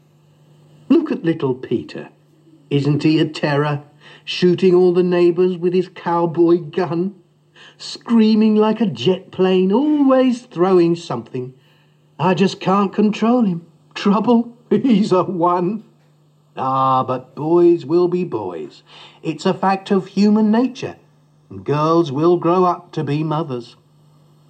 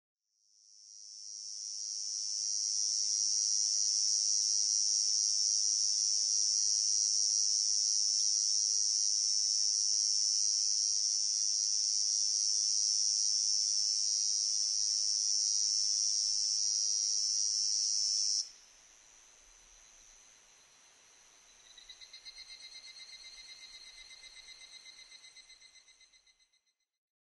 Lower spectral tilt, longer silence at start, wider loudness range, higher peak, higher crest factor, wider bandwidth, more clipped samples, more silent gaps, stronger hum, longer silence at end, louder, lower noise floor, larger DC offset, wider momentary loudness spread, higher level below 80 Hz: first, -7.5 dB/octave vs 6.5 dB/octave; about the same, 0.9 s vs 0.85 s; second, 3 LU vs 12 LU; first, -4 dBFS vs -20 dBFS; about the same, 14 dB vs 14 dB; second, 8.6 kHz vs 11.5 kHz; neither; neither; neither; second, 0.85 s vs 1.5 s; first, -17 LUFS vs -29 LUFS; second, -54 dBFS vs -78 dBFS; neither; second, 14 LU vs 21 LU; first, -72 dBFS vs -78 dBFS